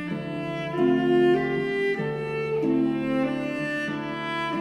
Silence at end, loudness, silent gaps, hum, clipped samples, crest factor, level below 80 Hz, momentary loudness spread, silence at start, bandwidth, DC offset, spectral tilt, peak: 0 s; -25 LUFS; none; none; under 0.1%; 14 dB; -58 dBFS; 9 LU; 0 s; 10.5 kHz; under 0.1%; -7 dB/octave; -10 dBFS